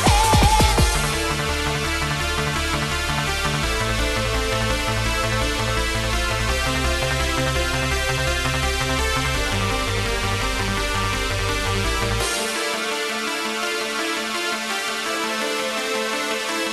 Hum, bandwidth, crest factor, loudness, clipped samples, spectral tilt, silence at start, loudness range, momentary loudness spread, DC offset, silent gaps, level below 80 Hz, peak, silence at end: none; 13 kHz; 18 dB; -21 LUFS; under 0.1%; -3.5 dB/octave; 0 s; 2 LU; 3 LU; under 0.1%; none; -28 dBFS; -4 dBFS; 0 s